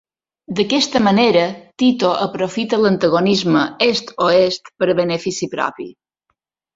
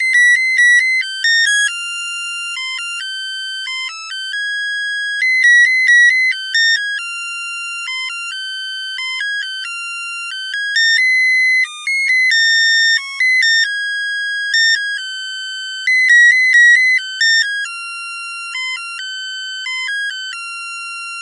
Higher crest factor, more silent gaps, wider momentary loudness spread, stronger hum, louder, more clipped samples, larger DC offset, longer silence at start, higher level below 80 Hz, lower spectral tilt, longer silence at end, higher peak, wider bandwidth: about the same, 16 dB vs 14 dB; neither; second, 9 LU vs 15 LU; neither; second, -16 LUFS vs -13 LUFS; neither; neither; first, 0.5 s vs 0 s; first, -56 dBFS vs -84 dBFS; first, -5 dB/octave vs 12 dB/octave; first, 0.85 s vs 0 s; about the same, -2 dBFS vs -2 dBFS; second, 7.8 kHz vs 11.5 kHz